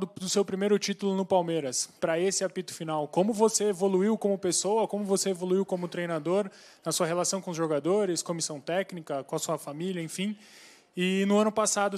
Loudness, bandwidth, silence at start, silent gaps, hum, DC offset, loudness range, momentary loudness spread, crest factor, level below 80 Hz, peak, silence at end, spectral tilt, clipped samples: -28 LUFS; 15 kHz; 0 s; none; none; under 0.1%; 4 LU; 9 LU; 18 dB; -78 dBFS; -10 dBFS; 0 s; -4 dB/octave; under 0.1%